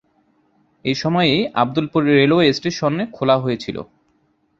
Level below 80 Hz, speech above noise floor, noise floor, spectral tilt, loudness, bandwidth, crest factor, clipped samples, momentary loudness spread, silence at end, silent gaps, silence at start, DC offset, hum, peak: -54 dBFS; 45 dB; -63 dBFS; -6 dB/octave; -18 LUFS; 7.6 kHz; 18 dB; under 0.1%; 11 LU; 0.75 s; none; 0.85 s; under 0.1%; none; -2 dBFS